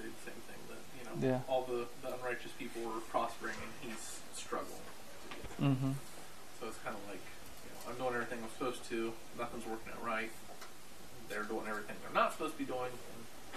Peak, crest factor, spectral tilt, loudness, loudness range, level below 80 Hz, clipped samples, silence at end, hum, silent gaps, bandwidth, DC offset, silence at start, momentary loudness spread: -18 dBFS; 24 dB; -5 dB/octave; -41 LUFS; 3 LU; -66 dBFS; under 0.1%; 0 s; none; none; 15 kHz; 0.5%; 0 s; 16 LU